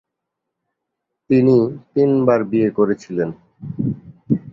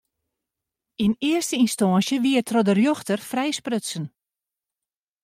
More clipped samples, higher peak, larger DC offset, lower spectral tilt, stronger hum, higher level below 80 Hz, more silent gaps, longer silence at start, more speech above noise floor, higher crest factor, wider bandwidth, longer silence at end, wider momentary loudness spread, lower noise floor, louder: neither; first, -2 dBFS vs -8 dBFS; neither; first, -9.5 dB/octave vs -5 dB/octave; neither; first, -54 dBFS vs -64 dBFS; neither; first, 1.3 s vs 1 s; second, 63 dB vs over 68 dB; about the same, 16 dB vs 16 dB; second, 7.4 kHz vs 16 kHz; second, 0 s vs 1.15 s; about the same, 12 LU vs 10 LU; second, -80 dBFS vs under -90 dBFS; first, -18 LUFS vs -22 LUFS